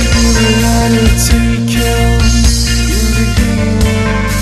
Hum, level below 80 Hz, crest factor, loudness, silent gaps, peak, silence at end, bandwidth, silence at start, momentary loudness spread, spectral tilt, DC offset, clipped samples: none; -14 dBFS; 10 dB; -11 LUFS; none; 0 dBFS; 0 s; 13.5 kHz; 0 s; 3 LU; -4.5 dB/octave; under 0.1%; under 0.1%